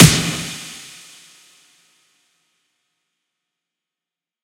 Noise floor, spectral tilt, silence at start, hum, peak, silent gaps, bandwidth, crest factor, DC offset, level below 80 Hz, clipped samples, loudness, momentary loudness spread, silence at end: -89 dBFS; -4 dB/octave; 0 s; none; 0 dBFS; none; 16 kHz; 22 dB; under 0.1%; -42 dBFS; 0.1%; -18 LUFS; 26 LU; 3.65 s